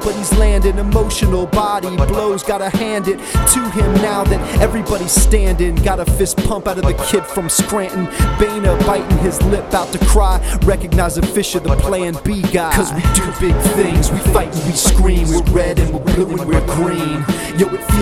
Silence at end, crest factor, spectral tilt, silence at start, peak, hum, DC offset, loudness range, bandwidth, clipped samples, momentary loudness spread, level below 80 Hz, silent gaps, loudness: 0 s; 14 dB; -5 dB/octave; 0 s; 0 dBFS; none; under 0.1%; 1 LU; 16 kHz; under 0.1%; 5 LU; -18 dBFS; none; -15 LUFS